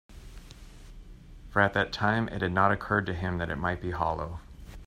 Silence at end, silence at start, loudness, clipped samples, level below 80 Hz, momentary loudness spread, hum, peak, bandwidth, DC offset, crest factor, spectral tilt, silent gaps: 0 s; 0.1 s; -28 LUFS; under 0.1%; -48 dBFS; 22 LU; none; -8 dBFS; 13 kHz; under 0.1%; 22 dB; -6.5 dB/octave; none